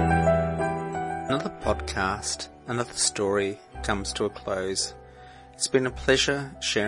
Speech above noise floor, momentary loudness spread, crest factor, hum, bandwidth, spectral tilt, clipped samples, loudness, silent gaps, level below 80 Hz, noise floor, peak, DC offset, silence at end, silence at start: 20 dB; 9 LU; 18 dB; none; 11.5 kHz; -3.5 dB/octave; under 0.1%; -27 LUFS; none; -44 dBFS; -47 dBFS; -8 dBFS; under 0.1%; 0 s; 0 s